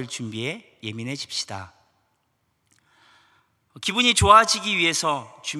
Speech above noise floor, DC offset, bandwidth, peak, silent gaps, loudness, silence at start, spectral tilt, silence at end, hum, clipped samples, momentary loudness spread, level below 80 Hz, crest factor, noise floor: 49 dB; under 0.1%; 14 kHz; 0 dBFS; none; -20 LUFS; 0 s; -2.5 dB/octave; 0 s; none; under 0.1%; 19 LU; -48 dBFS; 24 dB; -71 dBFS